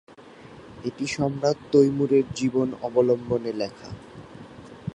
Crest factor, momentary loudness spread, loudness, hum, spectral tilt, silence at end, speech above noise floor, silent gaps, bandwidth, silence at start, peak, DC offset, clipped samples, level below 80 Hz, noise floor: 18 dB; 24 LU; -24 LUFS; none; -6.5 dB/octave; 0.05 s; 23 dB; none; 10.5 kHz; 0.2 s; -6 dBFS; under 0.1%; under 0.1%; -56 dBFS; -46 dBFS